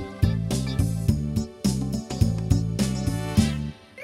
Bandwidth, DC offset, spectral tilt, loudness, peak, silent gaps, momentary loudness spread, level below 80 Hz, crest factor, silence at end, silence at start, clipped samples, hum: 16 kHz; under 0.1%; -6.5 dB/octave; -25 LUFS; -6 dBFS; none; 5 LU; -34 dBFS; 20 dB; 0 s; 0 s; under 0.1%; none